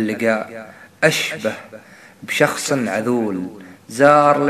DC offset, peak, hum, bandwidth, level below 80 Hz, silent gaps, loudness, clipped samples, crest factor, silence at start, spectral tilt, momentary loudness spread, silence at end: under 0.1%; 0 dBFS; none; 14 kHz; -66 dBFS; none; -18 LUFS; under 0.1%; 18 dB; 0 s; -4.5 dB/octave; 19 LU; 0 s